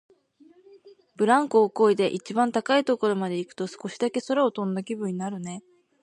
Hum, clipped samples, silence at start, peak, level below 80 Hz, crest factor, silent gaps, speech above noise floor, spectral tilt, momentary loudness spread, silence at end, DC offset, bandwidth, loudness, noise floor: none; under 0.1%; 0.85 s; -6 dBFS; -78 dBFS; 18 dB; none; 33 dB; -5.5 dB/octave; 13 LU; 0.4 s; under 0.1%; 11.5 kHz; -25 LUFS; -57 dBFS